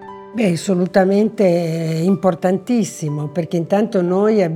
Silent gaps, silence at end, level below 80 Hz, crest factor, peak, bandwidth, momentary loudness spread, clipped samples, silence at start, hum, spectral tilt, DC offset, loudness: none; 0 s; -62 dBFS; 14 dB; -2 dBFS; 14 kHz; 7 LU; under 0.1%; 0 s; none; -7 dB/octave; under 0.1%; -17 LUFS